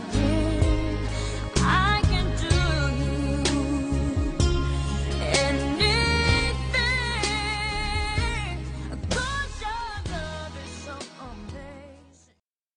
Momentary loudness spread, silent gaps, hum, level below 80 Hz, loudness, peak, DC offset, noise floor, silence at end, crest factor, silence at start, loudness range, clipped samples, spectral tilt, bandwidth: 16 LU; none; none; -30 dBFS; -25 LUFS; -6 dBFS; under 0.1%; -67 dBFS; 0.75 s; 18 dB; 0 s; 9 LU; under 0.1%; -4.5 dB/octave; 11 kHz